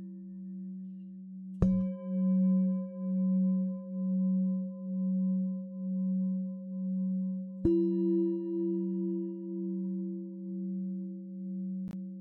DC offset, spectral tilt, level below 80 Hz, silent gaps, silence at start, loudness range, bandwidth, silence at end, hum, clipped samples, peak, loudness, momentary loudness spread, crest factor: under 0.1%; -14 dB/octave; -54 dBFS; none; 0 s; 5 LU; 1.7 kHz; 0 s; none; under 0.1%; -14 dBFS; -33 LUFS; 13 LU; 18 dB